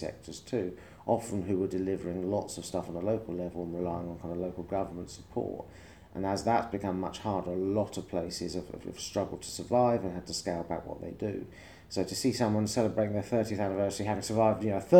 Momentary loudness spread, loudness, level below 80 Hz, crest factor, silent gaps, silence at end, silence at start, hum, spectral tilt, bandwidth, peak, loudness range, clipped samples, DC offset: 11 LU; -33 LUFS; -58 dBFS; 24 dB; none; 0 s; 0 s; none; -6 dB/octave; over 20 kHz; -8 dBFS; 4 LU; under 0.1%; under 0.1%